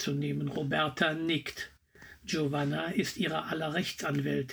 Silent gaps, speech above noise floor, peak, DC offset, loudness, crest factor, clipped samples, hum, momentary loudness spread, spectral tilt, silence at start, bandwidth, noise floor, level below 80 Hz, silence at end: none; 23 dB; -14 dBFS; under 0.1%; -32 LUFS; 20 dB; under 0.1%; none; 7 LU; -5 dB/octave; 0 s; over 20 kHz; -55 dBFS; -64 dBFS; 0 s